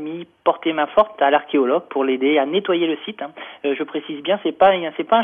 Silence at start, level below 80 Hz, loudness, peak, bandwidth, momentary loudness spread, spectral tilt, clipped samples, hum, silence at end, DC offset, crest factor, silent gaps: 0 s; -60 dBFS; -19 LUFS; -4 dBFS; 3.8 kHz; 11 LU; -7.5 dB/octave; under 0.1%; none; 0 s; under 0.1%; 16 dB; none